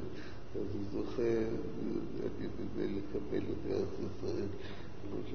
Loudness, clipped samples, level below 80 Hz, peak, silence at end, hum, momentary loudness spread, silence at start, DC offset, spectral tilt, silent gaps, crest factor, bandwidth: -39 LUFS; under 0.1%; -54 dBFS; -22 dBFS; 0 s; none; 11 LU; 0 s; 1%; -7 dB/octave; none; 16 dB; 6.4 kHz